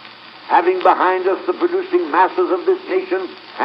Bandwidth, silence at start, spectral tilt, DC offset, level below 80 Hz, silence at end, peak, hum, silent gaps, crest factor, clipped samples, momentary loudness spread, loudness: 5.6 kHz; 0 s; -6 dB/octave; under 0.1%; -76 dBFS; 0 s; 0 dBFS; none; none; 16 dB; under 0.1%; 9 LU; -17 LUFS